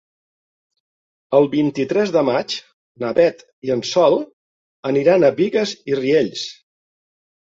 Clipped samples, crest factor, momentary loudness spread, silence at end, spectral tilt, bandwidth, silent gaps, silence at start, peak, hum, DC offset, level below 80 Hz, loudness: under 0.1%; 18 dB; 13 LU; 0.95 s; -5.5 dB/octave; 7.8 kHz; 2.73-2.95 s, 3.53-3.62 s, 4.33-4.83 s; 1.3 s; -2 dBFS; none; under 0.1%; -62 dBFS; -18 LUFS